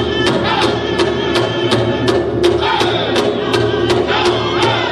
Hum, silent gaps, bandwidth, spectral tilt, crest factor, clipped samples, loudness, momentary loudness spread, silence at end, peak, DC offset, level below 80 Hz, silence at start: none; none; 12.5 kHz; -5 dB/octave; 12 dB; under 0.1%; -14 LUFS; 2 LU; 0 s; -2 dBFS; under 0.1%; -36 dBFS; 0 s